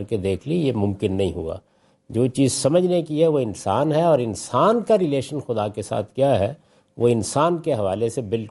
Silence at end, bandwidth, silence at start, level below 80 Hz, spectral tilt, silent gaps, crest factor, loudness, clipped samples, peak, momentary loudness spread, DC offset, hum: 0 s; 11.5 kHz; 0 s; -56 dBFS; -6 dB/octave; none; 16 dB; -21 LUFS; under 0.1%; -6 dBFS; 8 LU; under 0.1%; none